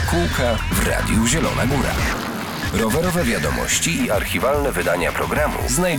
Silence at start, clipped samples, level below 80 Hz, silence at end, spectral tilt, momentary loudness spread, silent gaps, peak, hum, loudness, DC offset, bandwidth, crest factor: 0 s; under 0.1%; -30 dBFS; 0 s; -4 dB/octave; 3 LU; none; -6 dBFS; none; -19 LUFS; under 0.1%; 20 kHz; 14 dB